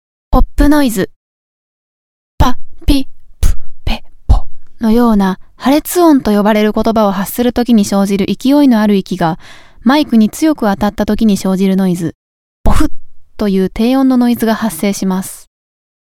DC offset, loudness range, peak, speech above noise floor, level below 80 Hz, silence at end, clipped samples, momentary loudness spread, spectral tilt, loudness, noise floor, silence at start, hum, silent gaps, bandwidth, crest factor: under 0.1%; 6 LU; 0 dBFS; over 79 dB; -20 dBFS; 0.7 s; under 0.1%; 10 LU; -6 dB/octave; -13 LUFS; under -90 dBFS; 0.3 s; none; 1.16-2.38 s, 12.15-12.64 s; 17.5 kHz; 12 dB